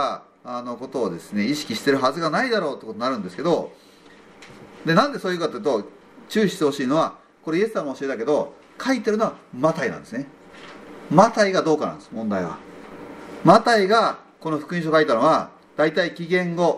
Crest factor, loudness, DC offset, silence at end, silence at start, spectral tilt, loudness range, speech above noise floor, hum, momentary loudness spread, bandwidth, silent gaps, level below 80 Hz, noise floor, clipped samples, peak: 22 dB; -22 LUFS; under 0.1%; 0 s; 0 s; -5.5 dB/octave; 5 LU; 27 dB; none; 17 LU; 14.5 kHz; none; -66 dBFS; -48 dBFS; under 0.1%; 0 dBFS